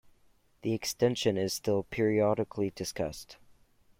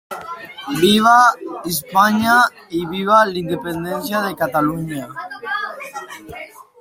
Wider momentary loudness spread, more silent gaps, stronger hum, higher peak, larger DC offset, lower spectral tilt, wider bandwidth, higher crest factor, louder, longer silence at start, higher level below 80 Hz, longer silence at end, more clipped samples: second, 10 LU vs 19 LU; neither; neither; second, -14 dBFS vs 0 dBFS; neither; about the same, -5 dB/octave vs -4 dB/octave; about the same, 16.5 kHz vs 16.5 kHz; about the same, 18 dB vs 18 dB; second, -31 LUFS vs -17 LUFS; first, 0.65 s vs 0.1 s; second, -60 dBFS vs -54 dBFS; first, 0.65 s vs 0.2 s; neither